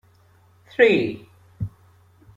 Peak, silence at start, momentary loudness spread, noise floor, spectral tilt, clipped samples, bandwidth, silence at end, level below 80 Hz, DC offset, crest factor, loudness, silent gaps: -2 dBFS; 0.8 s; 17 LU; -56 dBFS; -7 dB/octave; under 0.1%; 7.8 kHz; 0.7 s; -54 dBFS; under 0.1%; 22 dB; -19 LUFS; none